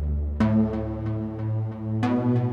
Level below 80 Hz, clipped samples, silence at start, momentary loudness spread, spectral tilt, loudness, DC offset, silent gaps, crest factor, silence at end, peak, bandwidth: -36 dBFS; under 0.1%; 0 s; 7 LU; -10 dB/octave; -26 LUFS; under 0.1%; none; 14 dB; 0 s; -10 dBFS; 6.6 kHz